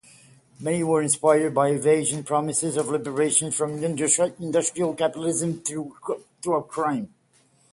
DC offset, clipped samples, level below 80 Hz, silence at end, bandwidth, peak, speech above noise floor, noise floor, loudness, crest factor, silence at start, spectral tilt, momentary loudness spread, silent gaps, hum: under 0.1%; under 0.1%; -66 dBFS; 0.65 s; 11.5 kHz; -6 dBFS; 38 dB; -61 dBFS; -24 LUFS; 18 dB; 0.6 s; -4 dB/octave; 11 LU; none; none